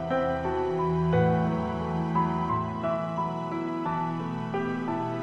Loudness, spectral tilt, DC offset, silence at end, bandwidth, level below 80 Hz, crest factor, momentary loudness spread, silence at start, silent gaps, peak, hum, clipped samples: -28 LUFS; -8.5 dB/octave; under 0.1%; 0 s; 7.2 kHz; -50 dBFS; 14 dB; 6 LU; 0 s; none; -12 dBFS; none; under 0.1%